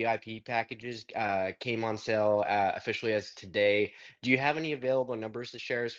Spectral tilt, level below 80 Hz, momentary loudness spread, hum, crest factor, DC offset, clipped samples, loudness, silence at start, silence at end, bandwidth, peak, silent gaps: -5.5 dB/octave; -72 dBFS; 10 LU; none; 20 dB; under 0.1%; under 0.1%; -31 LUFS; 0 s; 0 s; 7.6 kHz; -10 dBFS; none